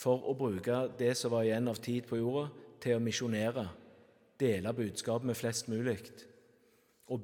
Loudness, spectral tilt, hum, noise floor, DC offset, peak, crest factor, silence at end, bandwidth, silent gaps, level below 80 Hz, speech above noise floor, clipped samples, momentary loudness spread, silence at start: -35 LUFS; -5.5 dB/octave; none; -68 dBFS; under 0.1%; -18 dBFS; 18 dB; 0 s; 18 kHz; none; -76 dBFS; 35 dB; under 0.1%; 9 LU; 0 s